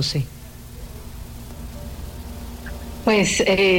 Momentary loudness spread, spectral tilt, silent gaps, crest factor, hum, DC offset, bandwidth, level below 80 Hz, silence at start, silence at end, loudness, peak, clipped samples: 21 LU; -4 dB/octave; none; 16 dB; none; under 0.1%; 17 kHz; -36 dBFS; 0 s; 0 s; -21 LUFS; -8 dBFS; under 0.1%